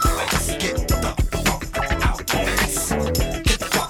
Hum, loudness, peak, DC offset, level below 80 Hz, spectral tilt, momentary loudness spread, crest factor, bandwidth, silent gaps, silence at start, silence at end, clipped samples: none; -21 LUFS; -4 dBFS; under 0.1%; -26 dBFS; -3.5 dB/octave; 3 LU; 16 dB; 19 kHz; none; 0 s; 0 s; under 0.1%